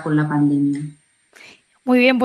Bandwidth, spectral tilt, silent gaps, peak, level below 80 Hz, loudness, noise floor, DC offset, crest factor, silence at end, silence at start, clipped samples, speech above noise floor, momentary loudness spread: 12 kHz; -7.5 dB/octave; none; -2 dBFS; -66 dBFS; -18 LUFS; -48 dBFS; under 0.1%; 18 dB; 0 s; 0 s; under 0.1%; 31 dB; 15 LU